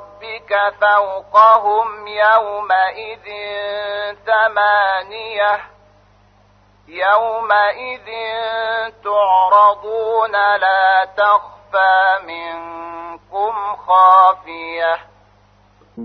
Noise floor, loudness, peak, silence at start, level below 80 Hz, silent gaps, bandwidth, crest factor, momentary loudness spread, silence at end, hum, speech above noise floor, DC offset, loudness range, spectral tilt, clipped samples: -52 dBFS; -15 LUFS; 0 dBFS; 0 s; -58 dBFS; none; 6.2 kHz; 16 dB; 16 LU; 0 s; 50 Hz at -55 dBFS; 36 dB; under 0.1%; 5 LU; -4 dB/octave; under 0.1%